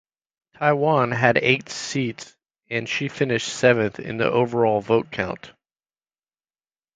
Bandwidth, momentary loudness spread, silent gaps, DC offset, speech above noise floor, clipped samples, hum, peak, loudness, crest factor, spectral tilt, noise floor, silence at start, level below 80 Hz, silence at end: 9.4 kHz; 10 LU; none; under 0.1%; over 69 dB; under 0.1%; none; 0 dBFS; -22 LUFS; 22 dB; -5 dB/octave; under -90 dBFS; 0.6 s; -58 dBFS; 1.45 s